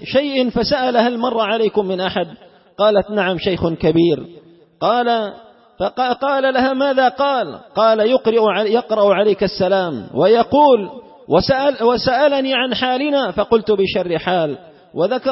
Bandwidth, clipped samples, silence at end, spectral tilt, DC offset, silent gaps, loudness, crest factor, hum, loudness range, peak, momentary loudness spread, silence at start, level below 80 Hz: 6 kHz; under 0.1%; 0 s; -8.5 dB/octave; under 0.1%; none; -16 LUFS; 14 dB; none; 3 LU; -2 dBFS; 7 LU; 0 s; -48 dBFS